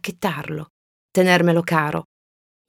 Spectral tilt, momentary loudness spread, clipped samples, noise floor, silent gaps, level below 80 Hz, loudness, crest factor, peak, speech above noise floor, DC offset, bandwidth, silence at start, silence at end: -5.5 dB/octave; 15 LU; under 0.1%; under -90 dBFS; 0.70-1.09 s; -60 dBFS; -20 LUFS; 20 dB; 0 dBFS; over 71 dB; under 0.1%; 17.5 kHz; 0.05 s; 0.65 s